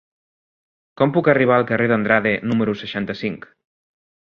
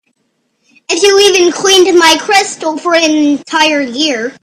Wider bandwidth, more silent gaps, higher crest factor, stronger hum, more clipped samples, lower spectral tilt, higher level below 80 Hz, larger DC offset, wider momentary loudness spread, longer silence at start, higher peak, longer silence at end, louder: second, 6.6 kHz vs 15.5 kHz; neither; first, 18 dB vs 10 dB; neither; second, under 0.1% vs 0.2%; first, -8.5 dB/octave vs -1 dB/octave; about the same, -58 dBFS vs -54 dBFS; neither; first, 10 LU vs 7 LU; about the same, 1 s vs 0.9 s; about the same, -2 dBFS vs 0 dBFS; first, 0.95 s vs 0.1 s; second, -19 LUFS vs -9 LUFS